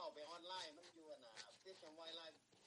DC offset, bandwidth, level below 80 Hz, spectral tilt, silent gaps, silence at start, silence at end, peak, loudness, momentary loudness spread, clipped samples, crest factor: under 0.1%; 11.5 kHz; under -90 dBFS; -1.5 dB/octave; none; 0 s; 0 s; -38 dBFS; -56 LUFS; 9 LU; under 0.1%; 20 dB